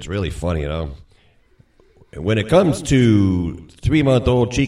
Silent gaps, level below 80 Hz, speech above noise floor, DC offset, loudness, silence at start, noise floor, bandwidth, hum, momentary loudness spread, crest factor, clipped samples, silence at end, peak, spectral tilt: none; -34 dBFS; 37 dB; under 0.1%; -18 LUFS; 0 s; -54 dBFS; 12.5 kHz; none; 13 LU; 18 dB; under 0.1%; 0 s; 0 dBFS; -6.5 dB/octave